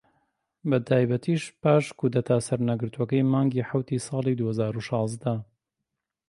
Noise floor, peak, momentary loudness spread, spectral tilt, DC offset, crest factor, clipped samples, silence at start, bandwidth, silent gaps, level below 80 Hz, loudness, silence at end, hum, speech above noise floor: -84 dBFS; -8 dBFS; 6 LU; -7 dB/octave; under 0.1%; 18 dB; under 0.1%; 0.65 s; 11.5 kHz; none; -64 dBFS; -26 LUFS; 0.85 s; none; 59 dB